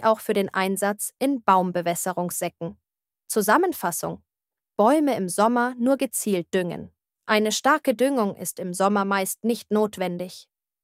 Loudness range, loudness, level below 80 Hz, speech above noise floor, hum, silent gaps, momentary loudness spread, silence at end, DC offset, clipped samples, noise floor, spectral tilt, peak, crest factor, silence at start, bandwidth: 2 LU; -23 LUFS; -68 dBFS; over 67 dB; none; none; 11 LU; 0.4 s; under 0.1%; under 0.1%; under -90 dBFS; -4 dB/octave; -4 dBFS; 20 dB; 0 s; 16 kHz